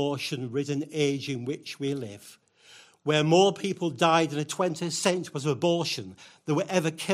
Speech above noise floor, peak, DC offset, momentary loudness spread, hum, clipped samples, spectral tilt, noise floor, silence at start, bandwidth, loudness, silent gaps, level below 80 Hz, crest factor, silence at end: 28 dB; -8 dBFS; under 0.1%; 13 LU; none; under 0.1%; -4.5 dB/octave; -55 dBFS; 0 s; 15.5 kHz; -27 LUFS; none; -72 dBFS; 20 dB; 0 s